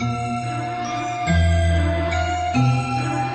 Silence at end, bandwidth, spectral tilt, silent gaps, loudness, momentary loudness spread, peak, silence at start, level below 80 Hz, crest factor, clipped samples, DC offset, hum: 0 s; 8.6 kHz; -6 dB/octave; none; -21 LUFS; 7 LU; -8 dBFS; 0 s; -30 dBFS; 14 dB; under 0.1%; under 0.1%; none